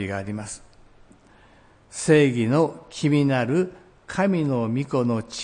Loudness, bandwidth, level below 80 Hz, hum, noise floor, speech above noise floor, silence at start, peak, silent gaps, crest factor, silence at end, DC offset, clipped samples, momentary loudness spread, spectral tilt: -23 LUFS; 10.5 kHz; -58 dBFS; none; -53 dBFS; 31 dB; 0 s; -6 dBFS; none; 18 dB; 0 s; under 0.1%; under 0.1%; 15 LU; -6 dB/octave